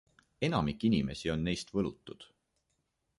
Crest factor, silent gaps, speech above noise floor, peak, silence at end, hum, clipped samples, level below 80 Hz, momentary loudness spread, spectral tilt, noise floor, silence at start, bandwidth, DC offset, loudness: 20 dB; none; 48 dB; -16 dBFS; 0.95 s; none; under 0.1%; -54 dBFS; 19 LU; -6 dB/octave; -80 dBFS; 0.4 s; 11.5 kHz; under 0.1%; -33 LUFS